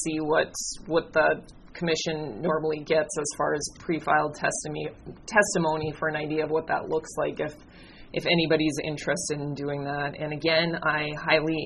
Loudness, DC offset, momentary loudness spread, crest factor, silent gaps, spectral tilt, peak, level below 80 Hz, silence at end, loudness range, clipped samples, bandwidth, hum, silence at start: -27 LUFS; under 0.1%; 8 LU; 22 dB; none; -4 dB/octave; -6 dBFS; -54 dBFS; 0 s; 2 LU; under 0.1%; 11.5 kHz; none; 0 s